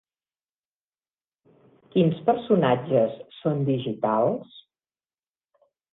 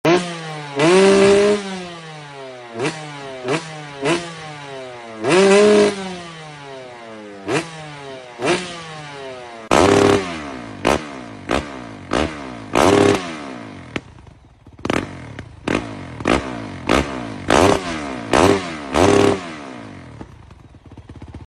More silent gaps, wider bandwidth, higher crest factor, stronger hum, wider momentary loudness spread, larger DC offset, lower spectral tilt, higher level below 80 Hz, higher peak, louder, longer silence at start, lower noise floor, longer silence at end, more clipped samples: neither; second, 4.1 kHz vs 13.5 kHz; about the same, 20 dB vs 18 dB; neither; second, 7 LU vs 21 LU; neither; first, -11 dB/octave vs -4.5 dB/octave; second, -66 dBFS vs -42 dBFS; second, -6 dBFS vs 0 dBFS; second, -24 LUFS vs -17 LUFS; first, 1.95 s vs 0.05 s; first, under -90 dBFS vs -45 dBFS; first, 1.35 s vs 0 s; neither